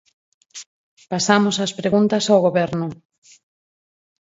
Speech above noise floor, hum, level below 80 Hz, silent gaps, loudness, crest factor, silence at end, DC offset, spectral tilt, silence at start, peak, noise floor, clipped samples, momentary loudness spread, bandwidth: over 72 dB; none; -62 dBFS; 0.66-0.97 s; -18 LUFS; 22 dB; 1.3 s; under 0.1%; -4.5 dB/octave; 0.55 s; 0 dBFS; under -90 dBFS; under 0.1%; 22 LU; 8 kHz